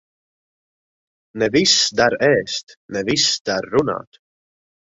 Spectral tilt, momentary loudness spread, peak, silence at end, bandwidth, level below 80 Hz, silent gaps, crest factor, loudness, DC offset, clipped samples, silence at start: -2.5 dB/octave; 14 LU; -2 dBFS; 0.95 s; 8 kHz; -56 dBFS; 2.63-2.67 s, 2.77-2.89 s, 3.40-3.45 s; 20 dB; -17 LUFS; under 0.1%; under 0.1%; 1.35 s